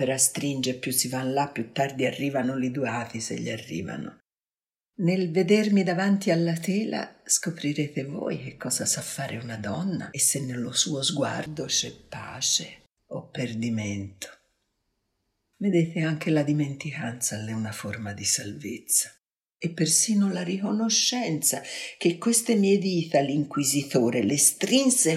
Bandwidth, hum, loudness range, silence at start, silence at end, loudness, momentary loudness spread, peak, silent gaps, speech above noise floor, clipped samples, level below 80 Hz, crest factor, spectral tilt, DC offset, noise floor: 16 kHz; none; 6 LU; 0 s; 0 s; -25 LUFS; 12 LU; -6 dBFS; none; over 64 dB; under 0.1%; -68 dBFS; 22 dB; -3.5 dB/octave; under 0.1%; under -90 dBFS